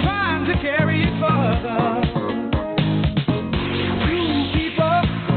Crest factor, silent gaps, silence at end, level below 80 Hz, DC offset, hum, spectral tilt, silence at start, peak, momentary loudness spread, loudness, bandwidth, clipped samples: 10 dB; none; 0 s; -32 dBFS; under 0.1%; none; -10.5 dB/octave; 0 s; -10 dBFS; 4 LU; -20 LUFS; 4.6 kHz; under 0.1%